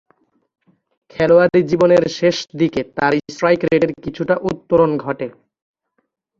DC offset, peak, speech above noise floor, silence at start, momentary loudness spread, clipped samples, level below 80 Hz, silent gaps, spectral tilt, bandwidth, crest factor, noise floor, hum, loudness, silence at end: under 0.1%; 0 dBFS; 54 dB; 1.15 s; 11 LU; under 0.1%; -52 dBFS; none; -6.5 dB/octave; 7.4 kHz; 16 dB; -70 dBFS; none; -16 LUFS; 1.1 s